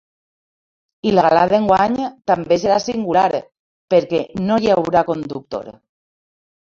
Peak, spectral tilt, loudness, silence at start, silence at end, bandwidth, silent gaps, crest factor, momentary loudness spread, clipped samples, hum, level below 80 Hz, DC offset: -2 dBFS; -6 dB/octave; -17 LUFS; 1.05 s; 0.95 s; 7.6 kHz; 3.59-3.88 s; 18 dB; 11 LU; under 0.1%; none; -52 dBFS; under 0.1%